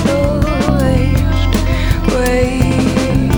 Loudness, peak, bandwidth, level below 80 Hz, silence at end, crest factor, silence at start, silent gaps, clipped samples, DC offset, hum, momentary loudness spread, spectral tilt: -14 LUFS; 0 dBFS; over 20 kHz; -18 dBFS; 0 s; 12 dB; 0 s; none; under 0.1%; under 0.1%; none; 2 LU; -6.5 dB/octave